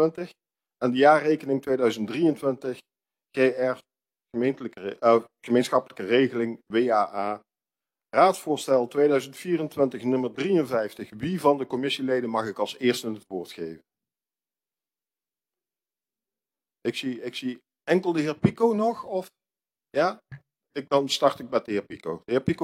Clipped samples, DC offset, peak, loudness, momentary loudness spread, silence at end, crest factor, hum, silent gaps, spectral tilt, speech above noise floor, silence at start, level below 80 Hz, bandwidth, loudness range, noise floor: under 0.1%; under 0.1%; -4 dBFS; -25 LUFS; 14 LU; 0 s; 22 dB; none; none; -5.5 dB/octave; over 65 dB; 0 s; -68 dBFS; 16 kHz; 9 LU; under -90 dBFS